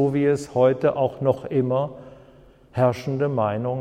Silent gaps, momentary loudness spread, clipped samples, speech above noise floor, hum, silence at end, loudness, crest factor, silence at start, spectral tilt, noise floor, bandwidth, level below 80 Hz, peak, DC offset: none; 6 LU; under 0.1%; 29 dB; none; 0 s; -22 LUFS; 16 dB; 0 s; -8 dB/octave; -51 dBFS; 11.5 kHz; -56 dBFS; -6 dBFS; under 0.1%